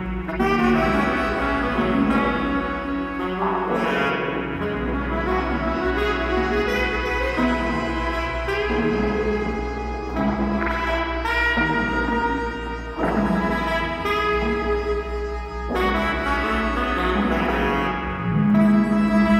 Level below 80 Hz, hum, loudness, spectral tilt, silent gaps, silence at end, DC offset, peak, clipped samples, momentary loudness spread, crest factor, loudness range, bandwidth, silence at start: -32 dBFS; none; -22 LUFS; -6.5 dB/octave; none; 0 s; under 0.1%; -6 dBFS; under 0.1%; 7 LU; 16 dB; 2 LU; 13.5 kHz; 0 s